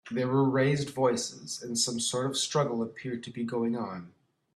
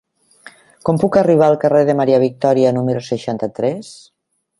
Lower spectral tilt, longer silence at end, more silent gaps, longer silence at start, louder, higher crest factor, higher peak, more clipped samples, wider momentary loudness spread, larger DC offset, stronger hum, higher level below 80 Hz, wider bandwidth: second, -4.5 dB/octave vs -7.5 dB/octave; second, 0.45 s vs 0.65 s; neither; second, 0.05 s vs 0.45 s; second, -29 LUFS vs -15 LUFS; about the same, 16 dB vs 16 dB; second, -14 dBFS vs 0 dBFS; neither; about the same, 11 LU vs 10 LU; neither; neither; second, -70 dBFS vs -56 dBFS; first, 13.5 kHz vs 11.5 kHz